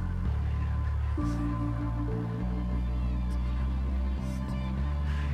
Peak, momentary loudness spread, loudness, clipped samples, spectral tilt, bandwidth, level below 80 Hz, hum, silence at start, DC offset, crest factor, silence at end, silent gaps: -20 dBFS; 2 LU; -32 LUFS; under 0.1%; -8.5 dB/octave; 6.4 kHz; -32 dBFS; none; 0 s; under 0.1%; 10 dB; 0 s; none